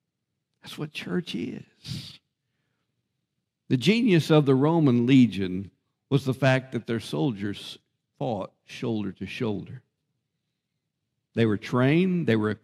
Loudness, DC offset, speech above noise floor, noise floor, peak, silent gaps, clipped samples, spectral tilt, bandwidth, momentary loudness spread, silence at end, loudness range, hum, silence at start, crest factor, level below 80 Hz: -25 LUFS; under 0.1%; 57 dB; -82 dBFS; -6 dBFS; none; under 0.1%; -7 dB/octave; 14 kHz; 18 LU; 0.1 s; 12 LU; none; 0.65 s; 20 dB; -68 dBFS